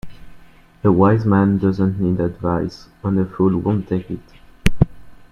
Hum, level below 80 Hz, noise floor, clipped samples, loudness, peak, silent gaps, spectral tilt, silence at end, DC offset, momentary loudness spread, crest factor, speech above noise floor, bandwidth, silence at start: none; -34 dBFS; -45 dBFS; under 0.1%; -19 LUFS; 0 dBFS; none; -8.5 dB/octave; 0.15 s; under 0.1%; 10 LU; 18 dB; 27 dB; 12 kHz; 0.05 s